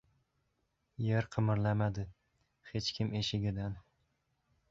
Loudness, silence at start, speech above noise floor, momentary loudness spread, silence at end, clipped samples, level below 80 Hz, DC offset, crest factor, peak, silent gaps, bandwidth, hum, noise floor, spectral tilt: -35 LUFS; 1 s; 47 dB; 12 LU; 0.9 s; under 0.1%; -58 dBFS; under 0.1%; 20 dB; -16 dBFS; none; 7.6 kHz; none; -80 dBFS; -6 dB/octave